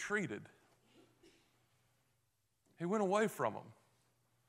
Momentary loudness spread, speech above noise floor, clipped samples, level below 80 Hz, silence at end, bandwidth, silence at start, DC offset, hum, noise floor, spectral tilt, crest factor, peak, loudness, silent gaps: 14 LU; 44 dB; under 0.1%; -84 dBFS; 0.75 s; 15.5 kHz; 0 s; under 0.1%; none; -82 dBFS; -5.5 dB/octave; 22 dB; -20 dBFS; -38 LUFS; none